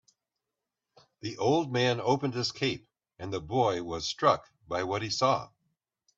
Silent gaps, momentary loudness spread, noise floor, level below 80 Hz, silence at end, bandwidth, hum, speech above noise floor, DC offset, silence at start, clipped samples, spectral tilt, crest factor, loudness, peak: none; 13 LU; -88 dBFS; -64 dBFS; 0.7 s; 8 kHz; none; 59 dB; under 0.1%; 1.25 s; under 0.1%; -5 dB/octave; 20 dB; -29 LUFS; -10 dBFS